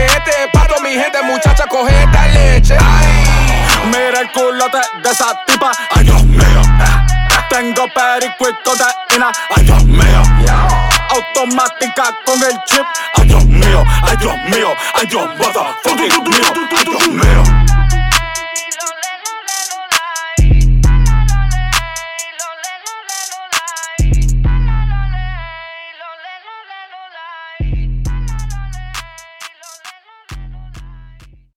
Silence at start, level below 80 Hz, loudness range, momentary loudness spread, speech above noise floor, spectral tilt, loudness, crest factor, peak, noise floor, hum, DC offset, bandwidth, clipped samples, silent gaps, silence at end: 0 s; -14 dBFS; 14 LU; 18 LU; 28 dB; -4 dB/octave; -12 LUFS; 10 dB; 0 dBFS; -39 dBFS; none; under 0.1%; 16.5 kHz; under 0.1%; none; 0.5 s